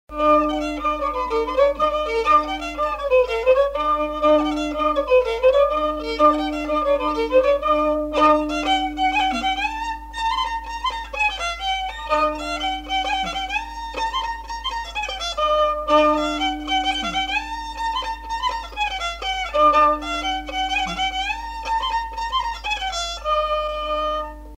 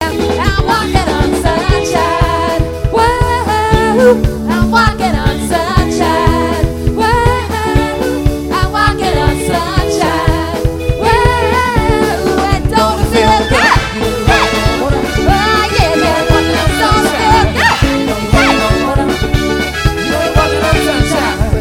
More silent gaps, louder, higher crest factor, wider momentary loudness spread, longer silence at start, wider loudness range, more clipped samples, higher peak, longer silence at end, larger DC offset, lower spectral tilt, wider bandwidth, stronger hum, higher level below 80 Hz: neither; second, -21 LUFS vs -12 LUFS; first, 18 dB vs 12 dB; first, 9 LU vs 5 LU; about the same, 0.1 s vs 0 s; first, 5 LU vs 2 LU; second, under 0.1% vs 0.4%; second, -4 dBFS vs 0 dBFS; about the same, 0 s vs 0 s; neither; second, -3.5 dB/octave vs -5 dB/octave; about the same, 16 kHz vs 17.5 kHz; neither; second, -40 dBFS vs -20 dBFS